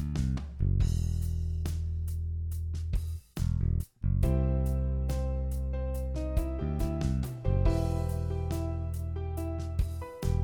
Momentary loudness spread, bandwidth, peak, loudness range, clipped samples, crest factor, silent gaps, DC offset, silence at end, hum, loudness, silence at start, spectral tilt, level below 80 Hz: 7 LU; 19 kHz; -14 dBFS; 1 LU; under 0.1%; 16 dB; none; under 0.1%; 0 s; none; -32 LUFS; 0 s; -8 dB/octave; -32 dBFS